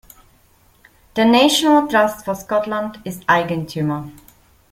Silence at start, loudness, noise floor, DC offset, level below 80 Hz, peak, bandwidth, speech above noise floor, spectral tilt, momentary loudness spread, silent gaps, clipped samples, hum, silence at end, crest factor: 1.15 s; -17 LUFS; -54 dBFS; under 0.1%; -54 dBFS; -2 dBFS; 16.5 kHz; 37 dB; -4.5 dB/octave; 15 LU; none; under 0.1%; none; 0.6 s; 18 dB